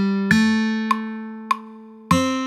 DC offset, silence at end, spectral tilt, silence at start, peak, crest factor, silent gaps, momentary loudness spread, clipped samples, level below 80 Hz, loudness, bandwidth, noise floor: under 0.1%; 0 s; -5 dB/octave; 0 s; -2 dBFS; 20 dB; none; 14 LU; under 0.1%; -56 dBFS; -21 LUFS; 14.5 kHz; -40 dBFS